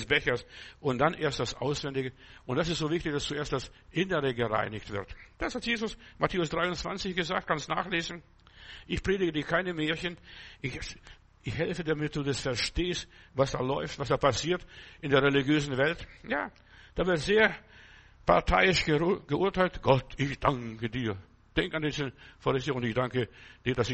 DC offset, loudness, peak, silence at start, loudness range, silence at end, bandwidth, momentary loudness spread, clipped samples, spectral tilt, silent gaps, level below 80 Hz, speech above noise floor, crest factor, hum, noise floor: under 0.1%; -30 LUFS; -8 dBFS; 0 s; 5 LU; 0 s; 8.4 kHz; 13 LU; under 0.1%; -5 dB/octave; none; -48 dBFS; 24 dB; 22 dB; none; -54 dBFS